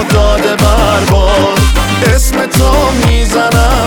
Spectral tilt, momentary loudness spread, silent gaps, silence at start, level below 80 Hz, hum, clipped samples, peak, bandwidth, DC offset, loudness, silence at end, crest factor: -5 dB/octave; 2 LU; none; 0 s; -12 dBFS; none; under 0.1%; 0 dBFS; 19.5 kHz; under 0.1%; -9 LUFS; 0 s; 8 dB